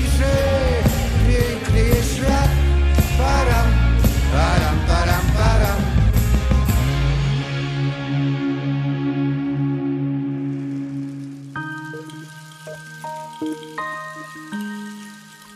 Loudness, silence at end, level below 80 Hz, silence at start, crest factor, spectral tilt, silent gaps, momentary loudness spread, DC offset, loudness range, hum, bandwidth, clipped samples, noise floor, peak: -20 LUFS; 0 s; -22 dBFS; 0 s; 16 dB; -6 dB/octave; none; 15 LU; under 0.1%; 13 LU; none; 15 kHz; under 0.1%; -41 dBFS; -4 dBFS